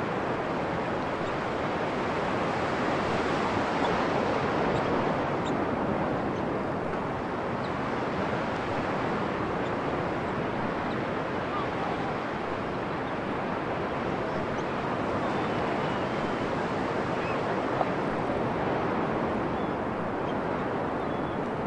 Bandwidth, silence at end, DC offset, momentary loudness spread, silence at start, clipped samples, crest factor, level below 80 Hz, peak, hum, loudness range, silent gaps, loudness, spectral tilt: 11 kHz; 0 s; under 0.1%; 4 LU; 0 s; under 0.1%; 16 dB; -52 dBFS; -14 dBFS; none; 3 LU; none; -29 LUFS; -6.5 dB/octave